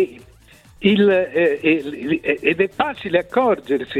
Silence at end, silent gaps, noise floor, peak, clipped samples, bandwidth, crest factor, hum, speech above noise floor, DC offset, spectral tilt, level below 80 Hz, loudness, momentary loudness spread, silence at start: 0 s; none; -48 dBFS; -2 dBFS; under 0.1%; 12 kHz; 16 dB; none; 30 dB; under 0.1%; -7 dB/octave; -54 dBFS; -19 LUFS; 7 LU; 0 s